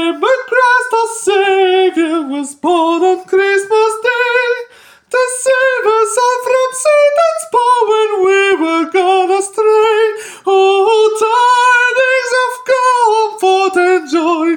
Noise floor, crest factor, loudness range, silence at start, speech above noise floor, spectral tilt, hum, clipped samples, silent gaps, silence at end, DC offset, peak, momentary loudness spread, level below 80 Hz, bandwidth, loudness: -40 dBFS; 10 dB; 2 LU; 0 s; 27 dB; -1 dB/octave; none; under 0.1%; none; 0 s; under 0.1%; -2 dBFS; 5 LU; -68 dBFS; 17 kHz; -12 LUFS